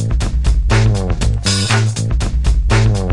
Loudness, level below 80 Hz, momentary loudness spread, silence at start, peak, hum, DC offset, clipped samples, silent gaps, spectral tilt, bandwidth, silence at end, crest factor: -15 LUFS; -16 dBFS; 4 LU; 0 s; -2 dBFS; none; under 0.1%; under 0.1%; none; -5 dB/octave; 11.5 kHz; 0 s; 12 dB